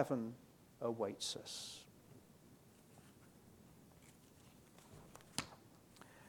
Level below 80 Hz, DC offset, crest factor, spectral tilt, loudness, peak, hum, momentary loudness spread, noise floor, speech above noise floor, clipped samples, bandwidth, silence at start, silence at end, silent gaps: -78 dBFS; under 0.1%; 28 dB; -4 dB/octave; -45 LUFS; -20 dBFS; none; 22 LU; -65 dBFS; 22 dB; under 0.1%; 19 kHz; 0 s; 0 s; none